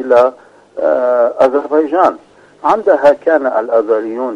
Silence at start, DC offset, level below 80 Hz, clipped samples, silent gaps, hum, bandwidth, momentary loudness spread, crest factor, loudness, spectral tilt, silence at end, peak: 0 s; under 0.1%; -58 dBFS; 0.1%; none; none; 8.4 kHz; 6 LU; 12 dB; -13 LUFS; -6 dB/octave; 0 s; 0 dBFS